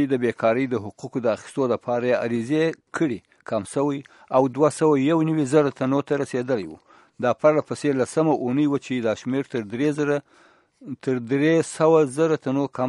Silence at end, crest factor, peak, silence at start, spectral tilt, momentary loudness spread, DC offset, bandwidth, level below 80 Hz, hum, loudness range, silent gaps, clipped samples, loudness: 0 s; 18 dB; -4 dBFS; 0 s; -6.5 dB/octave; 8 LU; under 0.1%; 11.5 kHz; -68 dBFS; none; 3 LU; none; under 0.1%; -23 LUFS